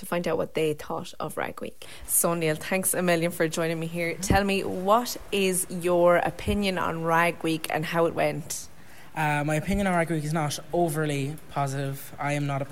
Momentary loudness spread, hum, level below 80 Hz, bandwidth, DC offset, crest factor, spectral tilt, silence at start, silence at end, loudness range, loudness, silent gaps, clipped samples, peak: 10 LU; none; -46 dBFS; 16 kHz; 0.8%; 18 dB; -4.5 dB/octave; 0 s; 0 s; 3 LU; -26 LUFS; none; under 0.1%; -8 dBFS